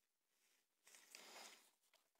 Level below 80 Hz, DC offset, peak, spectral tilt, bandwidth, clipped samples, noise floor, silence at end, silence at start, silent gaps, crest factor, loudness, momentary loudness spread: under -90 dBFS; under 0.1%; -38 dBFS; 1 dB/octave; 16 kHz; under 0.1%; -86 dBFS; 0.1 s; 0.3 s; none; 30 dB; -62 LUFS; 10 LU